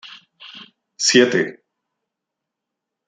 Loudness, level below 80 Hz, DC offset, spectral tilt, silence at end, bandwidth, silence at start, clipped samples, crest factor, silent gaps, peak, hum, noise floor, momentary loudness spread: -16 LUFS; -70 dBFS; under 0.1%; -2.5 dB/octave; 1.55 s; 9.6 kHz; 0.05 s; under 0.1%; 22 dB; none; -2 dBFS; none; -82 dBFS; 25 LU